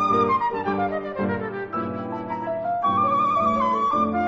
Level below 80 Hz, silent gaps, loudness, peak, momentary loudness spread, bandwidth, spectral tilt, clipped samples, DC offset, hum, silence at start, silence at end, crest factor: -58 dBFS; none; -23 LUFS; -8 dBFS; 9 LU; 7.6 kHz; -5 dB/octave; under 0.1%; under 0.1%; none; 0 s; 0 s; 14 dB